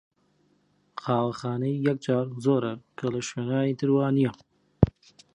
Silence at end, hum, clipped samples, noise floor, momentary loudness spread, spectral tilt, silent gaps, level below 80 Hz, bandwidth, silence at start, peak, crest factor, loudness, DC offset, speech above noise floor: 0.45 s; 50 Hz at -60 dBFS; under 0.1%; -67 dBFS; 7 LU; -7.5 dB/octave; none; -46 dBFS; 10.5 kHz; 0.95 s; -2 dBFS; 26 dB; -27 LUFS; under 0.1%; 41 dB